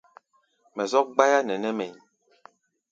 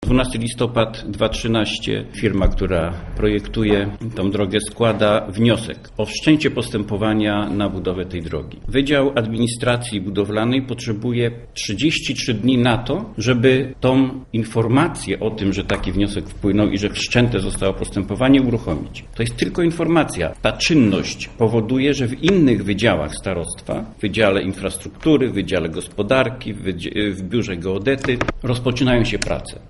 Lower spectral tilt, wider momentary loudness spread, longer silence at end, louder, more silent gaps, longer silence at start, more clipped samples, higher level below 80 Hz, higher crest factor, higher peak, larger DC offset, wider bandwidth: second, -3.5 dB/octave vs -5.5 dB/octave; first, 15 LU vs 9 LU; first, 0.95 s vs 0 s; second, -24 LUFS vs -19 LUFS; neither; first, 0.75 s vs 0 s; neither; second, -80 dBFS vs -34 dBFS; first, 24 dB vs 18 dB; second, -4 dBFS vs 0 dBFS; neither; second, 7.8 kHz vs 11.5 kHz